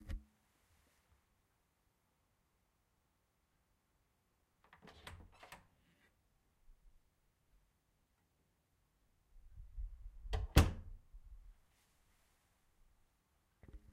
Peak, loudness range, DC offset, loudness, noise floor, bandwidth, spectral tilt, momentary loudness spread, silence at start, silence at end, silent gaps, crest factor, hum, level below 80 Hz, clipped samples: -12 dBFS; 22 LU; under 0.1%; -37 LUFS; -81 dBFS; 15.5 kHz; -5.5 dB/octave; 29 LU; 0.05 s; 0.15 s; none; 34 dB; none; -50 dBFS; under 0.1%